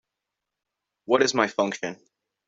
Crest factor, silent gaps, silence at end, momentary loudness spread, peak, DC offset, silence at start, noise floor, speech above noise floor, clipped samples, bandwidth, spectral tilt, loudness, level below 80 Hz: 22 dB; none; 0.55 s; 12 LU; -4 dBFS; under 0.1%; 1.1 s; -85 dBFS; 61 dB; under 0.1%; 7.8 kHz; -3.5 dB/octave; -24 LUFS; -72 dBFS